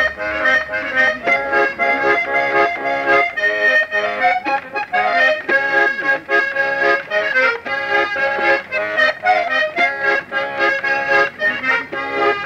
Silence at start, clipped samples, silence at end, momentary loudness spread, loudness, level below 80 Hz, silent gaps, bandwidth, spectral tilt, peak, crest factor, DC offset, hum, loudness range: 0 s; under 0.1%; 0 s; 4 LU; -16 LUFS; -54 dBFS; none; 15 kHz; -3.5 dB/octave; -4 dBFS; 12 dB; under 0.1%; none; 1 LU